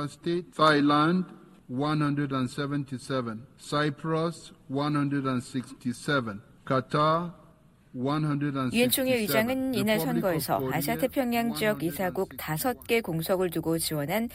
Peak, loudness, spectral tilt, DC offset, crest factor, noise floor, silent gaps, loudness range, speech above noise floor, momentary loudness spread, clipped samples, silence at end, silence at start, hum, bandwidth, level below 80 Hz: -10 dBFS; -28 LUFS; -5 dB/octave; under 0.1%; 18 dB; -57 dBFS; none; 4 LU; 30 dB; 10 LU; under 0.1%; 0 s; 0 s; none; 16 kHz; -58 dBFS